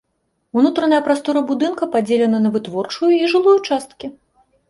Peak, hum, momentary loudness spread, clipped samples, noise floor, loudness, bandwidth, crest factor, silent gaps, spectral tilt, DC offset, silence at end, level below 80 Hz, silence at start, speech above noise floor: -2 dBFS; none; 10 LU; under 0.1%; -69 dBFS; -17 LUFS; 11.5 kHz; 14 dB; none; -5.5 dB/octave; under 0.1%; 0.6 s; -62 dBFS; 0.55 s; 53 dB